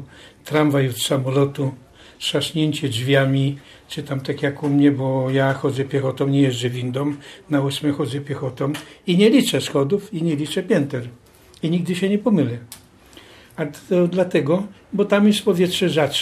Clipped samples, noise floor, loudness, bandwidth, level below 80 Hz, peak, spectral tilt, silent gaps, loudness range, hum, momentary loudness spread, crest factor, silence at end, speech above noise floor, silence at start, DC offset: under 0.1%; -46 dBFS; -20 LUFS; 15 kHz; -58 dBFS; -2 dBFS; -6 dB/octave; none; 2 LU; none; 11 LU; 18 dB; 0 s; 26 dB; 0 s; under 0.1%